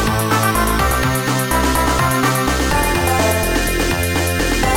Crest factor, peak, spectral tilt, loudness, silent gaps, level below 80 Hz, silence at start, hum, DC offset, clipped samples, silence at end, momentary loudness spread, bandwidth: 14 dB; -2 dBFS; -4 dB/octave; -16 LUFS; none; -24 dBFS; 0 s; none; 0.2%; under 0.1%; 0 s; 2 LU; 17 kHz